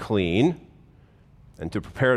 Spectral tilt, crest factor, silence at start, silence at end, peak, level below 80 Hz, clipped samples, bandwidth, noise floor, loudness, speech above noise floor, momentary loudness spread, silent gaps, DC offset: -7 dB/octave; 16 dB; 0 s; 0 s; -8 dBFS; -52 dBFS; under 0.1%; 12.5 kHz; -54 dBFS; -24 LUFS; 31 dB; 16 LU; none; under 0.1%